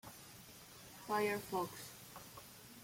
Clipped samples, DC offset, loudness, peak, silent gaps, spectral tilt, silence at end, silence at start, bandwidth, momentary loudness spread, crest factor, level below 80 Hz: under 0.1%; under 0.1%; -42 LUFS; -24 dBFS; none; -4 dB/octave; 0 s; 0.05 s; 16.5 kHz; 18 LU; 20 dB; -74 dBFS